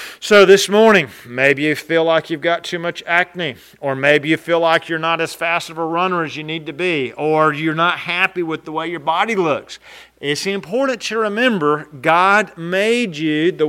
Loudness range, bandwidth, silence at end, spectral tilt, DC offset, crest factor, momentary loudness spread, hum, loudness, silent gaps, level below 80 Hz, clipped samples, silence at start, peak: 4 LU; 16 kHz; 0 s; -4.5 dB/octave; under 0.1%; 16 dB; 12 LU; none; -16 LUFS; none; -62 dBFS; under 0.1%; 0 s; 0 dBFS